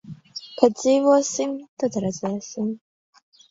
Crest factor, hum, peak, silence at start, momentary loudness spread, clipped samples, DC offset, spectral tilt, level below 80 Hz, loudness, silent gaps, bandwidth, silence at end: 22 dB; none; 0 dBFS; 0.05 s; 19 LU; under 0.1%; under 0.1%; -5 dB/octave; -66 dBFS; -22 LUFS; 1.68-1.77 s; 7.8 kHz; 0.75 s